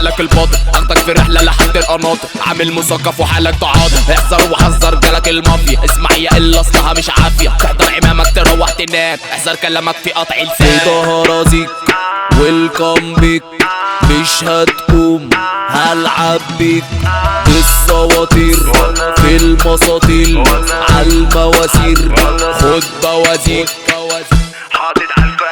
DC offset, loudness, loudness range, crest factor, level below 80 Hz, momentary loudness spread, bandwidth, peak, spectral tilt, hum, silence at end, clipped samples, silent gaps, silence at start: under 0.1%; -10 LUFS; 2 LU; 10 dB; -14 dBFS; 5 LU; over 20 kHz; 0 dBFS; -4 dB/octave; none; 0 s; 0.8%; none; 0 s